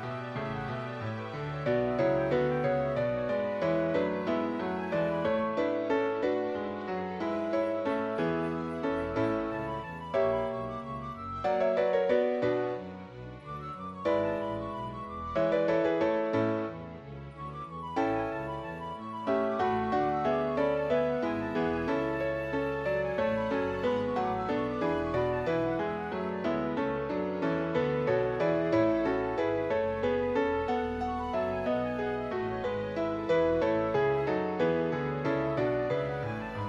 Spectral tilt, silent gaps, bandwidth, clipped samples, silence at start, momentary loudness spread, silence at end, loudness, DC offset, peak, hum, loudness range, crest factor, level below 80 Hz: -8 dB/octave; none; 8 kHz; under 0.1%; 0 s; 9 LU; 0 s; -31 LUFS; under 0.1%; -14 dBFS; none; 3 LU; 16 dB; -54 dBFS